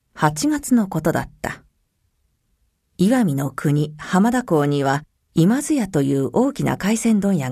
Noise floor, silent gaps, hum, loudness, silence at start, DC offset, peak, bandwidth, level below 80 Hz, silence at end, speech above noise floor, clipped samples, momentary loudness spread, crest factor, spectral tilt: -67 dBFS; none; none; -20 LUFS; 0.15 s; under 0.1%; -2 dBFS; 14 kHz; -50 dBFS; 0 s; 49 dB; under 0.1%; 7 LU; 18 dB; -6 dB/octave